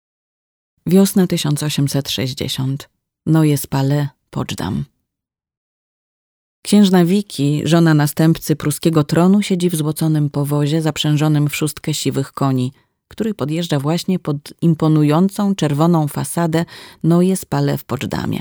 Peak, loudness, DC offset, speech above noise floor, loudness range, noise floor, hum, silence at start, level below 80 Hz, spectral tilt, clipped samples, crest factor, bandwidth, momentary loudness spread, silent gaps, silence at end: 0 dBFS; -17 LUFS; under 0.1%; 68 dB; 5 LU; -84 dBFS; none; 0.85 s; -50 dBFS; -6 dB/octave; under 0.1%; 16 dB; over 20 kHz; 10 LU; 5.57-6.63 s; 0 s